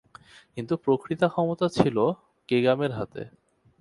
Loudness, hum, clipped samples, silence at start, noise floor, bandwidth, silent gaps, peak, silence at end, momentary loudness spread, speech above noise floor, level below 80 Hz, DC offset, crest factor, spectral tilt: -26 LUFS; none; under 0.1%; 0.55 s; -52 dBFS; 11.5 kHz; none; -2 dBFS; 0.5 s; 16 LU; 27 dB; -60 dBFS; under 0.1%; 24 dB; -7 dB/octave